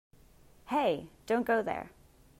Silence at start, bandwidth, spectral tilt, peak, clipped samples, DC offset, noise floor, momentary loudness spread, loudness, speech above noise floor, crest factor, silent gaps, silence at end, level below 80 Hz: 0.65 s; 16 kHz; -5.5 dB/octave; -16 dBFS; under 0.1%; under 0.1%; -59 dBFS; 10 LU; -32 LUFS; 28 dB; 18 dB; none; 0.5 s; -64 dBFS